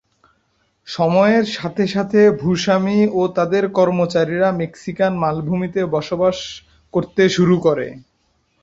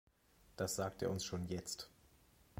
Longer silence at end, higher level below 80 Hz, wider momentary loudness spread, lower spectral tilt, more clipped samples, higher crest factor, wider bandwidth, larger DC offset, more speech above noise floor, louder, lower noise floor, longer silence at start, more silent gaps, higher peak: first, 0.65 s vs 0 s; first, -52 dBFS vs -64 dBFS; about the same, 10 LU vs 11 LU; first, -6.5 dB/octave vs -4 dB/octave; neither; about the same, 16 dB vs 18 dB; second, 7.8 kHz vs 16.5 kHz; neither; first, 47 dB vs 28 dB; first, -17 LUFS vs -42 LUFS; second, -64 dBFS vs -70 dBFS; first, 0.85 s vs 0.5 s; neither; first, -2 dBFS vs -26 dBFS